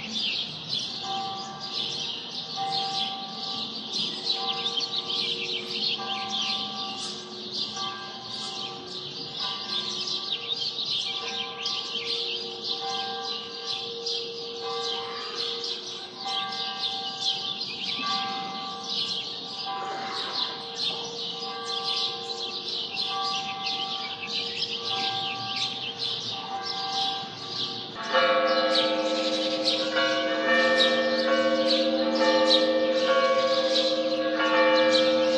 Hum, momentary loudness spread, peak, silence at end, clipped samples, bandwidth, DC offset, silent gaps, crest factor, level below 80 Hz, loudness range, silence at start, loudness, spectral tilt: none; 10 LU; -6 dBFS; 0 s; under 0.1%; 10.5 kHz; under 0.1%; none; 22 dB; -74 dBFS; 8 LU; 0 s; -27 LUFS; -2.5 dB/octave